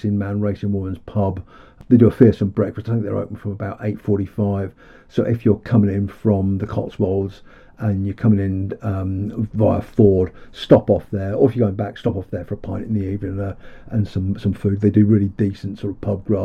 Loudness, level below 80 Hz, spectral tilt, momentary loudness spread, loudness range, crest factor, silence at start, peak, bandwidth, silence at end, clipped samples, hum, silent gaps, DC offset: -20 LUFS; -44 dBFS; -10 dB/octave; 13 LU; 4 LU; 18 dB; 0.05 s; 0 dBFS; 6 kHz; 0 s; under 0.1%; none; none; under 0.1%